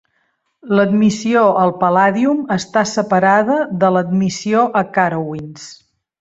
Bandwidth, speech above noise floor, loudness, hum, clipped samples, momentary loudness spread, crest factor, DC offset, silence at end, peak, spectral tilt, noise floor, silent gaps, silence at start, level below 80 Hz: 8 kHz; 51 dB; -15 LUFS; none; under 0.1%; 9 LU; 14 dB; under 0.1%; 0.45 s; -2 dBFS; -6 dB/octave; -65 dBFS; none; 0.65 s; -58 dBFS